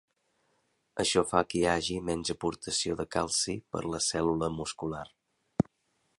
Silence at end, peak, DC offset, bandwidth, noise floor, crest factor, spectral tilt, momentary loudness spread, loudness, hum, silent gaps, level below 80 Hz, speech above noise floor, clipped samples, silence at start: 0.55 s; -8 dBFS; under 0.1%; 11.5 kHz; -76 dBFS; 24 dB; -3.5 dB/octave; 10 LU; -31 LUFS; none; none; -54 dBFS; 45 dB; under 0.1%; 0.95 s